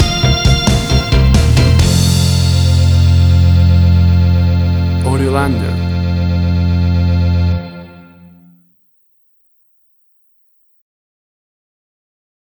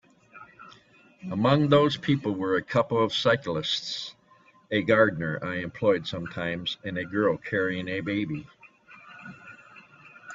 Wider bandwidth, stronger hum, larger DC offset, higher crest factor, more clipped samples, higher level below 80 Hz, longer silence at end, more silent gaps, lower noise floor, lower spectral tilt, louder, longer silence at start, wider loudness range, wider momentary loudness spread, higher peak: first, over 20 kHz vs 7.8 kHz; neither; neither; second, 12 dB vs 22 dB; neither; first, -20 dBFS vs -62 dBFS; first, 4.5 s vs 0 s; neither; second, -55 dBFS vs -59 dBFS; about the same, -6 dB/octave vs -6 dB/octave; first, -12 LUFS vs -26 LUFS; second, 0 s vs 0.35 s; about the same, 8 LU vs 6 LU; second, 6 LU vs 22 LU; first, 0 dBFS vs -6 dBFS